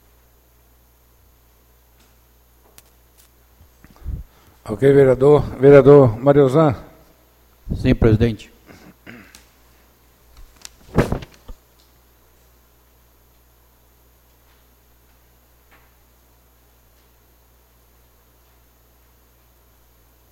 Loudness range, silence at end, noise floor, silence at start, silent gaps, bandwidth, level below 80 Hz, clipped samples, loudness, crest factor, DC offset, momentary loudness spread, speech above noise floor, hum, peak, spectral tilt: 16 LU; 8.8 s; -54 dBFS; 4.05 s; none; 15.5 kHz; -38 dBFS; under 0.1%; -14 LUFS; 20 dB; under 0.1%; 30 LU; 42 dB; 60 Hz at -50 dBFS; 0 dBFS; -8.5 dB/octave